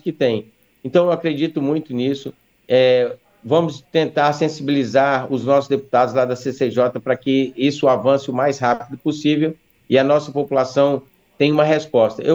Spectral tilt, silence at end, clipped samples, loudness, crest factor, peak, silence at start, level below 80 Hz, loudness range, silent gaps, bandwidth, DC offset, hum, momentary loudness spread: -6.5 dB/octave; 0 s; under 0.1%; -18 LUFS; 16 dB; -2 dBFS; 0.05 s; -64 dBFS; 1 LU; none; 7.8 kHz; under 0.1%; none; 6 LU